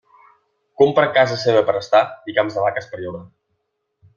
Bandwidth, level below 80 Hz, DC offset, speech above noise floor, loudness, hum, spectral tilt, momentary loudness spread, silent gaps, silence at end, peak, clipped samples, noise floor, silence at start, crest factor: 7.2 kHz; -62 dBFS; under 0.1%; 55 dB; -17 LUFS; none; -5.5 dB/octave; 15 LU; none; 0.9 s; -2 dBFS; under 0.1%; -73 dBFS; 0.8 s; 18 dB